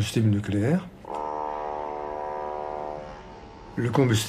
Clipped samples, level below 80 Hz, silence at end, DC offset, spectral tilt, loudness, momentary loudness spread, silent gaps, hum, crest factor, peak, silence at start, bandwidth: under 0.1%; -52 dBFS; 0 s; under 0.1%; -6 dB/octave; -28 LUFS; 15 LU; none; none; 18 dB; -8 dBFS; 0 s; 15.5 kHz